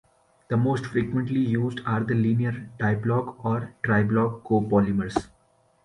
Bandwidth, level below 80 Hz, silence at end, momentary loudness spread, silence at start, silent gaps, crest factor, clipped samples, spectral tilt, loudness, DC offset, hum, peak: 10.5 kHz; -52 dBFS; 0.6 s; 6 LU; 0.5 s; none; 18 dB; under 0.1%; -8.5 dB/octave; -25 LUFS; under 0.1%; none; -6 dBFS